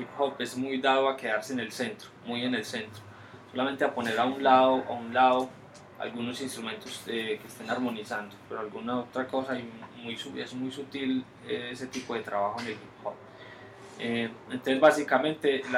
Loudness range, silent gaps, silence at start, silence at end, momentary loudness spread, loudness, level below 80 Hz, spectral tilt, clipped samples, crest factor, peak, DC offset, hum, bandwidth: 8 LU; none; 0 s; 0 s; 17 LU; -30 LUFS; -72 dBFS; -4.5 dB/octave; under 0.1%; 22 dB; -8 dBFS; under 0.1%; none; 16 kHz